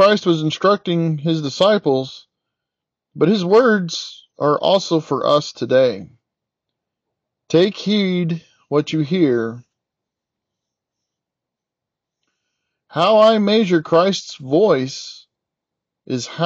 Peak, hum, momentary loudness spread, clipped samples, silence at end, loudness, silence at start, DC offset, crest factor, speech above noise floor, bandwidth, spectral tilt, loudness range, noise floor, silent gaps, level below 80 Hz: -2 dBFS; none; 13 LU; under 0.1%; 0 s; -17 LUFS; 0 s; under 0.1%; 16 dB; 68 dB; 8.2 kHz; -6 dB/octave; 7 LU; -84 dBFS; none; -68 dBFS